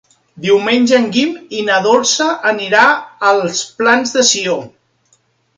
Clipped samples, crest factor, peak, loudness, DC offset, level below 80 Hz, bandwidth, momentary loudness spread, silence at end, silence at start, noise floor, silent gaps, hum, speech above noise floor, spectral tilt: under 0.1%; 14 dB; 0 dBFS; -13 LUFS; under 0.1%; -62 dBFS; 10 kHz; 8 LU; 0.9 s; 0.35 s; -58 dBFS; none; none; 45 dB; -2.5 dB/octave